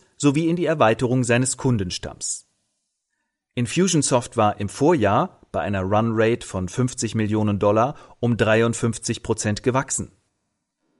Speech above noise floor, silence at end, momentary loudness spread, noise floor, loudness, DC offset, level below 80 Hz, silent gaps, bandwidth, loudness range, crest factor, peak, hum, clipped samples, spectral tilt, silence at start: 57 dB; 0.95 s; 9 LU; -77 dBFS; -21 LUFS; under 0.1%; -50 dBFS; none; 11.5 kHz; 2 LU; 18 dB; -4 dBFS; none; under 0.1%; -5 dB/octave; 0.2 s